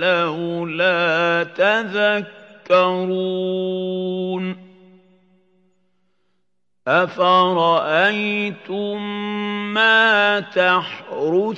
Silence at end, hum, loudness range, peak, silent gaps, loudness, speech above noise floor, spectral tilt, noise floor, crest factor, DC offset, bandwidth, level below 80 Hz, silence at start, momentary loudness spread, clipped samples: 0 s; none; 9 LU; -2 dBFS; none; -18 LUFS; 58 dB; -6 dB/octave; -76 dBFS; 18 dB; under 0.1%; 7.8 kHz; -76 dBFS; 0 s; 11 LU; under 0.1%